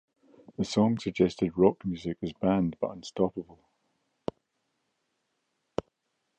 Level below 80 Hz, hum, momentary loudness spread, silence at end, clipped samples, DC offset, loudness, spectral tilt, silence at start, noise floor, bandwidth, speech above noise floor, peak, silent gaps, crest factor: -58 dBFS; none; 15 LU; 2.95 s; under 0.1%; under 0.1%; -29 LUFS; -7 dB/octave; 0.6 s; -79 dBFS; 9.2 kHz; 51 dB; -8 dBFS; none; 24 dB